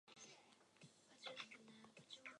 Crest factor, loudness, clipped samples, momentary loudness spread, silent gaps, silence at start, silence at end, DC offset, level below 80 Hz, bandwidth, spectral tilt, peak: 26 dB; -59 LUFS; under 0.1%; 14 LU; none; 0.05 s; 0 s; under 0.1%; under -90 dBFS; 11 kHz; -2 dB/octave; -36 dBFS